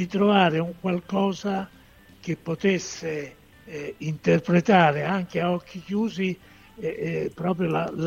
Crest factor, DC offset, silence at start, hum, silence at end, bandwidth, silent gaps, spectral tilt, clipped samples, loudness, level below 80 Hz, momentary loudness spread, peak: 20 dB; under 0.1%; 0 s; none; 0 s; 7.2 kHz; none; -6.5 dB/octave; under 0.1%; -25 LUFS; -58 dBFS; 15 LU; -6 dBFS